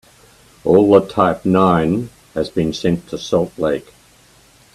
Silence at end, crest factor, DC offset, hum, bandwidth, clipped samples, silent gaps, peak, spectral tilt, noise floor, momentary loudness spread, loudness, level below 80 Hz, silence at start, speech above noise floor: 0.95 s; 18 dB; under 0.1%; none; 13.5 kHz; under 0.1%; none; 0 dBFS; -7 dB/octave; -50 dBFS; 12 LU; -17 LUFS; -48 dBFS; 0.65 s; 34 dB